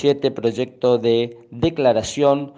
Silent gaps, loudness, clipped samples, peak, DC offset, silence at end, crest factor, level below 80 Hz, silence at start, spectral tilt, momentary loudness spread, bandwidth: none; -20 LUFS; under 0.1%; -4 dBFS; under 0.1%; 0.05 s; 16 dB; -50 dBFS; 0 s; -5.5 dB/octave; 6 LU; 9.6 kHz